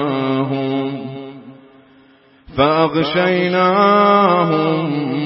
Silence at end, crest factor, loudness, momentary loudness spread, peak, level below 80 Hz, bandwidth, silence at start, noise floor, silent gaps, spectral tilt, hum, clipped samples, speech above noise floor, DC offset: 0 s; 16 dB; -15 LUFS; 16 LU; -2 dBFS; -52 dBFS; 5.8 kHz; 0 s; -49 dBFS; none; -11 dB/octave; none; under 0.1%; 35 dB; under 0.1%